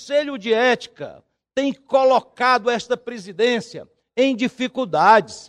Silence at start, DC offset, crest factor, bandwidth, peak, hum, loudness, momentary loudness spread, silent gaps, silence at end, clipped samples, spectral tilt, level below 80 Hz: 0 s; under 0.1%; 18 dB; 10.5 kHz; -2 dBFS; none; -19 LUFS; 17 LU; none; 0.05 s; under 0.1%; -4 dB/octave; -66 dBFS